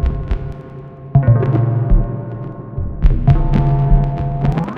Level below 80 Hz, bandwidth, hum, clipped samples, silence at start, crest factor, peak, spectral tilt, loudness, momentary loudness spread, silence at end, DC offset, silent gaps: -18 dBFS; 4.4 kHz; none; under 0.1%; 0 s; 14 dB; 0 dBFS; -10.5 dB/octave; -17 LUFS; 14 LU; 0 s; under 0.1%; none